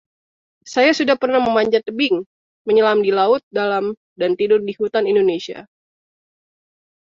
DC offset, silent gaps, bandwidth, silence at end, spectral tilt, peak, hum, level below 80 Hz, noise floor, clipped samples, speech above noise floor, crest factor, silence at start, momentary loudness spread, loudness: under 0.1%; 2.26-2.65 s, 3.43-3.51 s, 3.97-4.16 s; 7.6 kHz; 1.5 s; -4.5 dB/octave; -2 dBFS; none; -62 dBFS; under -90 dBFS; under 0.1%; over 73 dB; 16 dB; 0.65 s; 9 LU; -17 LUFS